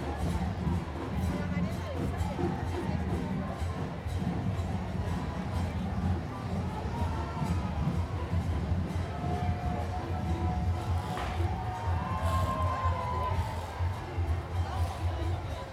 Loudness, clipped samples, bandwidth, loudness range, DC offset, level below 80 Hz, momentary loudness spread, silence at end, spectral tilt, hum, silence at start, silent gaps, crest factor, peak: -33 LUFS; under 0.1%; 13 kHz; 2 LU; under 0.1%; -38 dBFS; 3 LU; 0 s; -7.5 dB/octave; none; 0 s; none; 14 dB; -18 dBFS